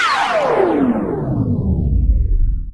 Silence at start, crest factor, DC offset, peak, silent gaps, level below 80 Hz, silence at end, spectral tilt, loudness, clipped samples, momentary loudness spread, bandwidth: 0 s; 12 dB; under 0.1%; -4 dBFS; none; -20 dBFS; 0 s; -7 dB/octave; -17 LUFS; under 0.1%; 5 LU; 10.5 kHz